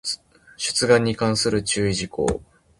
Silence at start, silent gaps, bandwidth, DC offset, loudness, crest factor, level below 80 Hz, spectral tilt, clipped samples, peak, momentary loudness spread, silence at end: 0.05 s; none; 11.5 kHz; under 0.1%; -21 LUFS; 20 dB; -44 dBFS; -4 dB/octave; under 0.1%; -2 dBFS; 11 LU; 0.4 s